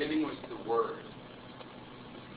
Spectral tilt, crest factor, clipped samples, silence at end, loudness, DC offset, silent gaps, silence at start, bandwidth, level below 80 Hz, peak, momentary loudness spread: -4 dB/octave; 18 dB; under 0.1%; 0 s; -35 LUFS; under 0.1%; none; 0 s; 4 kHz; -66 dBFS; -18 dBFS; 16 LU